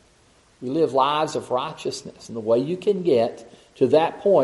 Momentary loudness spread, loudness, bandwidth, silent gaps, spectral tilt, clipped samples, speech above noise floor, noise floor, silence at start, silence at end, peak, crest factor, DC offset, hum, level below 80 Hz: 12 LU; -22 LUFS; 11.5 kHz; none; -5.5 dB/octave; under 0.1%; 36 dB; -57 dBFS; 0.6 s; 0 s; -6 dBFS; 16 dB; under 0.1%; none; -64 dBFS